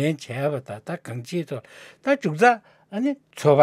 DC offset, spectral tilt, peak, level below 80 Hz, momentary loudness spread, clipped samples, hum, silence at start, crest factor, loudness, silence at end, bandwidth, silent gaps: under 0.1%; -6.5 dB/octave; -2 dBFS; -76 dBFS; 15 LU; under 0.1%; none; 0 s; 20 dB; -25 LUFS; 0 s; 15 kHz; none